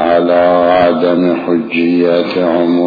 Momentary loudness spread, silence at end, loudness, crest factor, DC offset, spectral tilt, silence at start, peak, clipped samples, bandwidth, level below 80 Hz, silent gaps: 4 LU; 0 s; -11 LUFS; 10 dB; under 0.1%; -8.5 dB/octave; 0 s; 0 dBFS; under 0.1%; 5 kHz; -48 dBFS; none